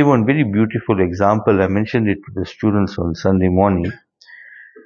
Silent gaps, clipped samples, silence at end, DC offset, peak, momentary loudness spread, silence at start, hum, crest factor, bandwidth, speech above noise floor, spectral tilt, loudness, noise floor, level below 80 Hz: none; under 0.1%; 0.25 s; under 0.1%; 0 dBFS; 7 LU; 0 s; none; 16 dB; 7 kHz; 27 dB; -8.5 dB/octave; -17 LUFS; -43 dBFS; -44 dBFS